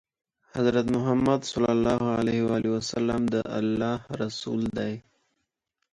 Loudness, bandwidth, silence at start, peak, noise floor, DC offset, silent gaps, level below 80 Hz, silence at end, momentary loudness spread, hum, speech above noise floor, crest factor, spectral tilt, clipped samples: -26 LUFS; 10 kHz; 0.55 s; -8 dBFS; -80 dBFS; under 0.1%; none; -54 dBFS; 0.9 s; 8 LU; none; 55 dB; 18 dB; -6 dB/octave; under 0.1%